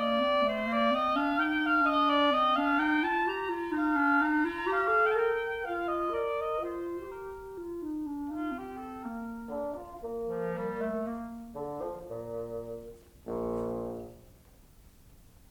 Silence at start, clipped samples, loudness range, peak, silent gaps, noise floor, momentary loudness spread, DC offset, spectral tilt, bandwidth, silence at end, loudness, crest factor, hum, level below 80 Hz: 0 s; under 0.1%; 12 LU; -16 dBFS; none; -57 dBFS; 15 LU; under 0.1%; -5.5 dB/octave; 19 kHz; 0.35 s; -30 LUFS; 16 dB; none; -58 dBFS